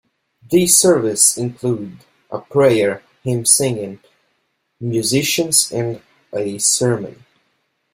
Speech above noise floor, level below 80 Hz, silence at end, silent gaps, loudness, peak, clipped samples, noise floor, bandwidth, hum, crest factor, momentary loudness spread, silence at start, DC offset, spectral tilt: 51 dB; -56 dBFS; 0.8 s; none; -15 LUFS; 0 dBFS; under 0.1%; -68 dBFS; 16.5 kHz; none; 18 dB; 17 LU; 0.5 s; under 0.1%; -3.5 dB/octave